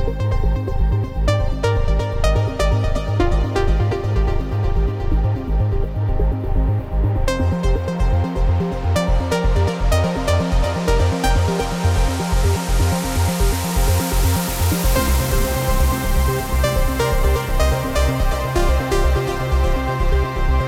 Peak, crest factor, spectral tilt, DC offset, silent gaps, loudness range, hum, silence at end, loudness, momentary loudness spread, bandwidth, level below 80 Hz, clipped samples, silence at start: -6 dBFS; 10 dB; -5.5 dB/octave; under 0.1%; none; 2 LU; none; 0 s; -20 LUFS; 3 LU; 17 kHz; -20 dBFS; under 0.1%; 0 s